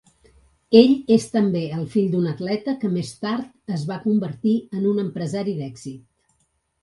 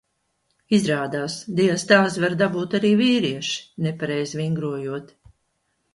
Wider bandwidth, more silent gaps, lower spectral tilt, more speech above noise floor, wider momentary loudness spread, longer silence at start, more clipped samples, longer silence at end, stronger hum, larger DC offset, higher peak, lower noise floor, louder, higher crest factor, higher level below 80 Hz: about the same, 11.5 kHz vs 11.5 kHz; neither; first, -7 dB/octave vs -5 dB/octave; about the same, 48 dB vs 50 dB; about the same, 13 LU vs 11 LU; about the same, 0.7 s vs 0.7 s; neither; about the same, 0.85 s vs 0.9 s; neither; neither; about the same, 0 dBFS vs 0 dBFS; about the same, -69 dBFS vs -72 dBFS; about the same, -21 LUFS vs -22 LUFS; about the same, 22 dB vs 22 dB; about the same, -60 dBFS vs -62 dBFS